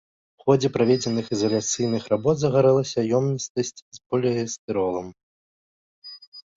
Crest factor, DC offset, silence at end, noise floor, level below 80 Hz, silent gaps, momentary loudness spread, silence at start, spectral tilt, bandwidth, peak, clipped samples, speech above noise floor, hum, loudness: 18 dB; under 0.1%; 0.15 s; under -90 dBFS; -60 dBFS; 3.50-3.55 s, 3.82-3.91 s, 4.06-4.10 s, 4.58-4.68 s, 5.23-6.02 s, 6.27-6.32 s; 13 LU; 0.45 s; -5.5 dB/octave; 7.8 kHz; -6 dBFS; under 0.1%; over 68 dB; none; -23 LUFS